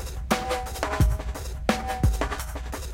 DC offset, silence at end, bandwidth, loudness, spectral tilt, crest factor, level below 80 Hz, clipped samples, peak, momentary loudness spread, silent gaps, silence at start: under 0.1%; 0 s; 17 kHz; -28 LUFS; -5 dB/octave; 20 dB; -30 dBFS; under 0.1%; -6 dBFS; 9 LU; none; 0 s